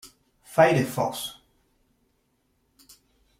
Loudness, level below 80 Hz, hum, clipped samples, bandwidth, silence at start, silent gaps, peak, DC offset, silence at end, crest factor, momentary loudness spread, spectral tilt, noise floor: -24 LUFS; -66 dBFS; none; under 0.1%; 16 kHz; 0.05 s; none; -6 dBFS; under 0.1%; 2.05 s; 24 dB; 15 LU; -5.5 dB/octave; -71 dBFS